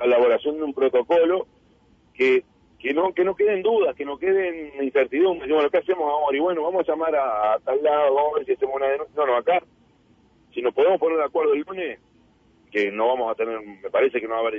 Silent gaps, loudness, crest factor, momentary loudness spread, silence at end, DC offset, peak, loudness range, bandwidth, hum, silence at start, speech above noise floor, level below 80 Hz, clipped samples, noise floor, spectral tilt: none; -22 LUFS; 12 dB; 8 LU; 0 s; under 0.1%; -10 dBFS; 3 LU; 5.8 kHz; none; 0 s; 37 dB; -62 dBFS; under 0.1%; -58 dBFS; -6.5 dB/octave